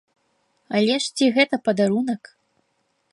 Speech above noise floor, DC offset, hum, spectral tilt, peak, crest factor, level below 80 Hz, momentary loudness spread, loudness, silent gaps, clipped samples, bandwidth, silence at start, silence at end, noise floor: 50 dB; under 0.1%; none; -4.5 dB/octave; -4 dBFS; 18 dB; -72 dBFS; 8 LU; -21 LUFS; none; under 0.1%; 11.5 kHz; 0.7 s; 0.95 s; -70 dBFS